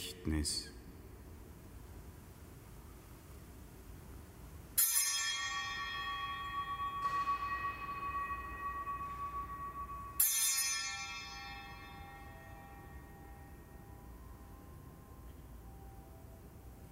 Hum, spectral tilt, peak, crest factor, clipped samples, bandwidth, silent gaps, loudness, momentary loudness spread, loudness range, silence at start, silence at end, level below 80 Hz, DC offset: none; -1.5 dB/octave; -16 dBFS; 26 dB; under 0.1%; 16 kHz; none; -36 LUFS; 24 LU; 19 LU; 0 s; 0 s; -54 dBFS; under 0.1%